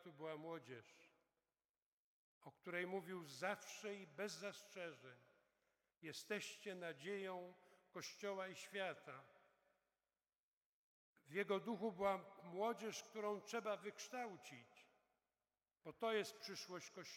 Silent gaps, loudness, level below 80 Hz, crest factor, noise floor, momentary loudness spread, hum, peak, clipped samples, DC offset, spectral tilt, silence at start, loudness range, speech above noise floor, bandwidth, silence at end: 1.69-1.74 s, 1.82-2.41 s, 10.39-11.14 s; -49 LUFS; under -90 dBFS; 24 dB; under -90 dBFS; 16 LU; none; -28 dBFS; under 0.1%; under 0.1%; -3.5 dB/octave; 0 s; 7 LU; over 41 dB; 17.5 kHz; 0 s